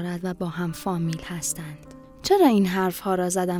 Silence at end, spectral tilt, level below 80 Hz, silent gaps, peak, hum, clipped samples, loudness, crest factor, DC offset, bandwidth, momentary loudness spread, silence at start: 0 s; -5 dB/octave; -54 dBFS; none; -6 dBFS; none; under 0.1%; -24 LUFS; 18 dB; under 0.1%; 16 kHz; 14 LU; 0 s